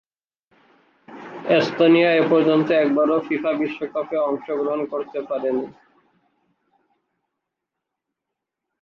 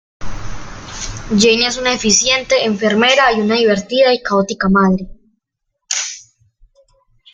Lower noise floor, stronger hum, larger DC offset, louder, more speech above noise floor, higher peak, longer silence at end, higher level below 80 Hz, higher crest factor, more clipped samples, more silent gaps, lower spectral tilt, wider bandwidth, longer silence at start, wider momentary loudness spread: first, -83 dBFS vs -74 dBFS; neither; neither; second, -20 LUFS vs -13 LUFS; first, 64 dB vs 60 dB; second, -4 dBFS vs 0 dBFS; first, 3.1 s vs 1.15 s; second, -70 dBFS vs -38 dBFS; about the same, 18 dB vs 16 dB; neither; neither; first, -7 dB/octave vs -3 dB/octave; second, 6.8 kHz vs 9.6 kHz; first, 1.1 s vs 0.2 s; second, 12 LU vs 20 LU